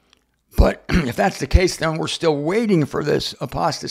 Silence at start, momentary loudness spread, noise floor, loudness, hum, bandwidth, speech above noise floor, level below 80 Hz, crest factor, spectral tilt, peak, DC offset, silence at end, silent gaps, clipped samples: 0.55 s; 4 LU; -61 dBFS; -20 LUFS; none; 15.5 kHz; 41 dB; -26 dBFS; 20 dB; -5.5 dB/octave; 0 dBFS; under 0.1%; 0 s; none; under 0.1%